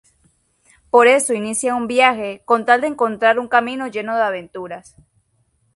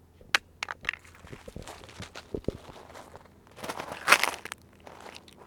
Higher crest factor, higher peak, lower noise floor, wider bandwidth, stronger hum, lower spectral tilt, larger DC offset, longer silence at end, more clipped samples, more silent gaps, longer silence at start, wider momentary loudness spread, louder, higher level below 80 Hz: second, 18 dB vs 34 dB; about the same, 0 dBFS vs 0 dBFS; first, -63 dBFS vs -52 dBFS; second, 11.5 kHz vs over 20 kHz; neither; about the same, -2.5 dB/octave vs -1.5 dB/octave; neither; first, 0.95 s vs 0 s; neither; neither; first, 0.95 s vs 0.35 s; second, 15 LU vs 25 LU; first, -17 LUFS vs -29 LUFS; second, -62 dBFS vs -56 dBFS